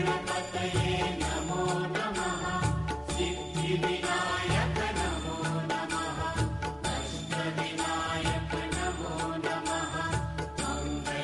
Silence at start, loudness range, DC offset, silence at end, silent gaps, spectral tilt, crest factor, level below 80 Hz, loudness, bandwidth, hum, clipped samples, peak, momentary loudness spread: 0 s; 2 LU; under 0.1%; 0 s; none; -4.5 dB/octave; 12 dB; -42 dBFS; -31 LUFS; 11.5 kHz; none; under 0.1%; -18 dBFS; 4 LU